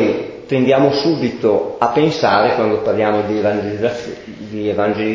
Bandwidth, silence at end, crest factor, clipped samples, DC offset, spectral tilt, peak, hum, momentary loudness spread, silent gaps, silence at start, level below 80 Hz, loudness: 7.6 kHz; 0 s; 16 dB; under 0.1%; under 0.1%; -6.5 dB/octave; 0 dBFS; none; 10 LU; none; 0 s; -50 dBFS; -16 LUFS